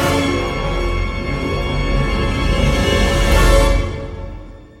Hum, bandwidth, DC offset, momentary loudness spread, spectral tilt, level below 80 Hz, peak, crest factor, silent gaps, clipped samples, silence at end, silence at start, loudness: none; 15.5 kHz; under 0.1%; 13 LU; -5 dB/octave; -20 dBFS; -2 dBFS; 14 dB; none; under 0.1%; 0.15 s; 0 s; -17 LUFS